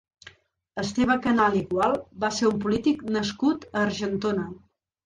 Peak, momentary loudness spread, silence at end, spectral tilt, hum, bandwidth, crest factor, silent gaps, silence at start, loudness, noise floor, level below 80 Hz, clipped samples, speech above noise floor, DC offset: -10 dBFS; 8 LU; 0.5 s; -5 dB/octave; none; 10.5 kHz; 16 dB; none; 0.25 s; -25 LUFS; -53 dBFS; -54 dBFS; under 0.1%; 28 dB; under 0.1%